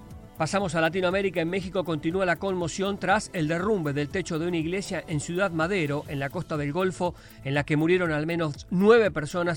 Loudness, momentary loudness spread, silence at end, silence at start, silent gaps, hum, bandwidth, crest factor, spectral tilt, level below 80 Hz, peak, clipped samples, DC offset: -26 LUFS; 7 LU; 0 s; 0 s; none; none; 17 kHz; 20 dB; -6 dB/octave; -50 dBFS; -6 dBFS; under 0.1%; under 0.1%